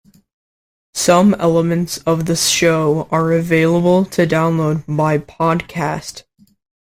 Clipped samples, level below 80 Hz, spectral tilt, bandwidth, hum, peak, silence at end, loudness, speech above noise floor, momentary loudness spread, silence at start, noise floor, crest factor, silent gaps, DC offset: under 0.1%; -48 dBFS; -5 dB/octave; 16 kHz; none; 0 dBFS; 0.65 s; -15 LUFS; over 75 dB; 8 LU; 0.95 s; under -90 dBFS; 16 dB; none; under 0.1%